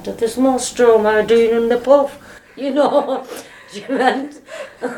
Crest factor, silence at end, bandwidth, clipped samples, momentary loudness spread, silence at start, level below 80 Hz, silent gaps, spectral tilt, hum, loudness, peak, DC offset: 16 dB; 0 s; 17.5 kHz; under 0.1%; 20 LU; 0 s; -52 dBFS; none; -4 dB/octave; none; -16 LUFS; 0 dBFS; under 0.1%